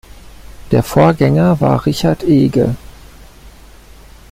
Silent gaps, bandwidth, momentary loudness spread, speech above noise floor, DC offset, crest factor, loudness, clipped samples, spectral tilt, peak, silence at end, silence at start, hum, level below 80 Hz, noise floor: none; 16 kHz; 6 LU; 27 dB; under 0.1%; 14 dB; -13 LUFS; under 0.1%; -7.5 dB/octave; 0 dBFS; 0.8 s; 0.5 s; none; -36 dBFS; -39 dBFS